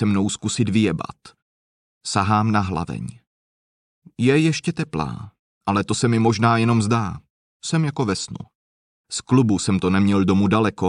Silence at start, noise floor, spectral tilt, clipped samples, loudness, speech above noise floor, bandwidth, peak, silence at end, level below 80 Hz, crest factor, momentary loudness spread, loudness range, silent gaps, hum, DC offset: 0 s; under -90 dBFS; -6 dB/octave; under 0.1%; -20 LUFS; over 70 dB; 11 kHz; -4 dBFS; 0 s; -52 dBFS; 18 dB; 14 LU; 4 LU; 1.42-2.01 s, 3.27-4.02 s, 5.39-5.61 s, 7.30-7.60 s, 8.55-9.04 s; none; under 0.1%